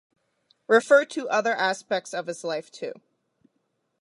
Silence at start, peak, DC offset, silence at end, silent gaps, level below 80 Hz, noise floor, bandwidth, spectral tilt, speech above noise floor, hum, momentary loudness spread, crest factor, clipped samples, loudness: 0.7 s; -6 dBFS; under 0.1%; 1.1 s; none; -84 dBFS; -75 dBFS; 11.5 kHz; -3 dB/octave; 51 dB; none; 16 LU; 20 dB; under 0.1%; -24 LUFS